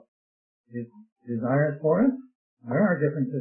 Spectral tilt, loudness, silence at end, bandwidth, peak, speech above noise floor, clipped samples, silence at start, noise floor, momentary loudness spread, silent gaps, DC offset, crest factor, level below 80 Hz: -15 dB/octave; -25 LUFS; 0 s; 2.7 kHz; -10 dBFS; over 65 dB; under 0.1%; 0.7 s; under -90 dBFS; 17 LU; 1.12-1.16 s, 2.35-2.57 s; under 0.1%; 16 dB; -66 dBFS